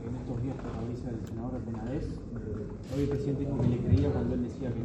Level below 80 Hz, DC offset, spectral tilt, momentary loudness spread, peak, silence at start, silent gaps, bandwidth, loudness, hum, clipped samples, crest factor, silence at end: -44 dBFS; under 0.1%; -9 dB/octave; 11 LU; -14 dBFS; 0 s; none; 8.6 kHz; -33 LUFS; none; under 0.1%; 18 dB; 0 s